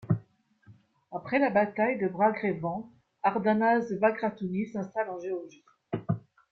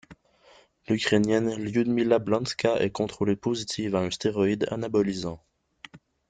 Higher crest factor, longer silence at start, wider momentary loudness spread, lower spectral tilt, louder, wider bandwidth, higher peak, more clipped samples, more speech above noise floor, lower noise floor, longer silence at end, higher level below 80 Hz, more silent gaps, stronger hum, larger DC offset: about the same, 18 dB vs 18 dB; about the same, 0 s vs 0.1 s; first, 13 LU vs 6 LU; first, -8.5 dB/octave vs -5.5 dB/octave; second, -29 LUFS vs -26 LUFS; second, 6.6 kHz vs 9.4 kHz; about the same, -10 dBFS vs -8 dBFS; neither; about the same, 32 dB vs 32 dB; about the same, -60 dBFS vs -58 dBFS; about the same, 0.35 s vs 0.3 s; second, -66 dBFS vs -60 dBFS; neither; neither; neither